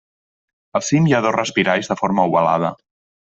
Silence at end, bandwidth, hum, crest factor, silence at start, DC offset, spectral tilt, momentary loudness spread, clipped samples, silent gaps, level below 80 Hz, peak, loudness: 0.5 s; 8 kHz; none; 18 dB; 0.75 s; under 0.1%; -5.5 dB/octave; 7 LU; under 0.1%; none; -56 dBFS; -2 dBFS; -18 LUFS